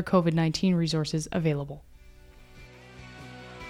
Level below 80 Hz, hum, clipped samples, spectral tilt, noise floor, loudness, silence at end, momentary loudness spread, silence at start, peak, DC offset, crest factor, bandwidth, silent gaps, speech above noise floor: -52 dBFS; none; under 0.1%; -6 dB/octave; -51 dBFS; -27 LUFS; 0 s; 23 LU; 0 s; -10 dBFS; under 0.1%; 20 dB; 12 kHz; none; 25 dB